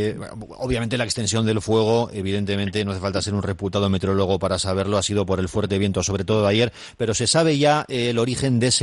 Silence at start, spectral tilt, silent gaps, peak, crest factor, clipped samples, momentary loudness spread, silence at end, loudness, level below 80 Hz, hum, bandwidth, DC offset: 0 s; -4.5 dB/octave; none; -6 dBFS; 16 dB; under 0.1%; 7 LU; 0 s; -21 LUFS; -46 dBFS; none; 11.5 kHz; under 0.1%